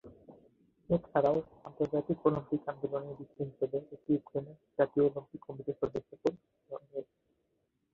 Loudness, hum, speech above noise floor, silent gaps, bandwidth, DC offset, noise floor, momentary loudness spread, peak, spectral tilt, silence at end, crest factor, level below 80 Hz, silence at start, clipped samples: -34 LUFS; none; 45 dB; none; 7.2 kHz; under 0.1%; -79 dBFS; 15 LU; -12 dBFS; -9.5 dB/octave; 0.9 s; 22 dB; -66 dBFS; 0.05 s; under 0.1%